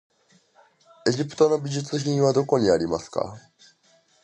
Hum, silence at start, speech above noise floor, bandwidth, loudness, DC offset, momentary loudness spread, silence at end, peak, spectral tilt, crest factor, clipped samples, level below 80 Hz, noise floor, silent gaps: none; 1.05 s; 39 dB; 9.2 kHz; -23 LUFS; under 0.1%; 9 LU; 0.85 s; -6 dBFS; -6 dB/octave; 20 dB; under 0.1%; -58 dBFS; -61 dBFS; none